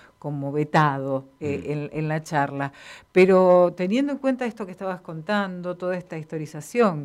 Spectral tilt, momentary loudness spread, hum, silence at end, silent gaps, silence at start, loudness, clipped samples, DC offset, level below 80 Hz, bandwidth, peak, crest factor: -7 dB/octave; 15 LU; none; 0 s; none; 0.25 s; -24 LUFS; under 0.1%; under 0.1%; -64 dBFS; 13.5 kHz; -6 dBFS; 18 dB